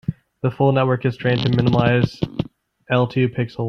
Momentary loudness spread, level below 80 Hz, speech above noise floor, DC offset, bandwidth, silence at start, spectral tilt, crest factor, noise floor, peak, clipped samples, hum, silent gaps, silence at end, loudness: 9 LU; -48 dBFS; 22 dB; under 0.1%; 6.4 kHz; 0.1 s; -8.5 dB/octave; 16 dB; -40 dBFS; -2 dBFS; under 0.1%; none; none; 0 s; -19 LUFS